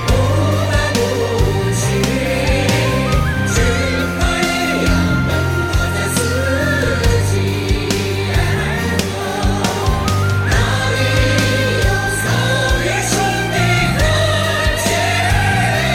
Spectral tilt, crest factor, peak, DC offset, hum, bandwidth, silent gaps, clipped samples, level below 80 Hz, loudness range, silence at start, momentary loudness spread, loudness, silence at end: -4.5 dB/octave; 12 dB; -2 dBFS; under 0.1%; none; 16.5 kHz; none; under 0.1%; -24 dBFS; 2 LU; 0 s; 3 LU; -16 LUFS; 0 s